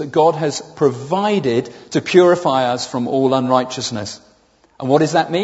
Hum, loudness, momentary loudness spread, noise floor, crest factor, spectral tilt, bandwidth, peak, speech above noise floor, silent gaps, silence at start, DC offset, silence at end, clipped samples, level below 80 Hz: none; -17 LUFS; 10 LU; -54 dBFS; 16 dB; -5.5 dB/octave; 8 kHz; 0 dBFS; 38 dB; none; 0 s; under 0.1%; 0 s; under 0.1%; -60 dBFS